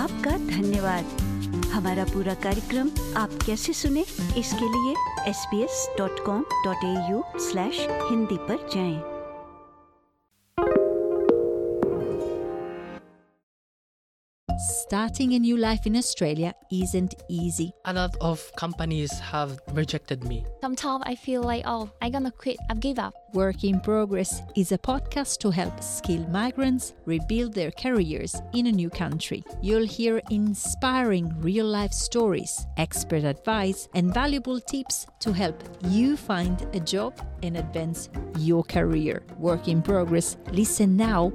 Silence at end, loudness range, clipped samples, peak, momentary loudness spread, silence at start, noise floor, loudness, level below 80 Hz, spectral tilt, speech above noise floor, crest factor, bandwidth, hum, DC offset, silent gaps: 0 s; 4 LU; under 0.1%; -6 dBFS; 7 LU; 0 s; -69 dBFS; -26 LUFS; -40 dBFS; -5 dB/octave; 43 dB; 20 dB; 15.5 kHz; none; under 0.1%; 13.43-14.47 s